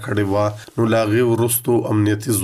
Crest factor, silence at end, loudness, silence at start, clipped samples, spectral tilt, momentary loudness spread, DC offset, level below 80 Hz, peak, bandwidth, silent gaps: 12 dB; 0 s; -18 LUFS; 0 s; under 0.1%; -5.5 dB/octave; 4 LU; under 0.1%; -54 dBFS; -6 dBFS; 15.5 kHz; none